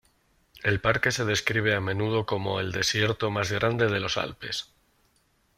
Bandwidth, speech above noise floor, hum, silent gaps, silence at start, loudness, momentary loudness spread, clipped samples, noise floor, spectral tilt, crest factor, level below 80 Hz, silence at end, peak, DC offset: 15.5 kHz; 41 dB; none; none; 0.55 s; -26 LUFS; 7 LU; under 0.1%; -68 dBFS; -4 dB/octave; 22 dB; -54 dBFS; 0.95 s; -6 dBFS; under 0.1%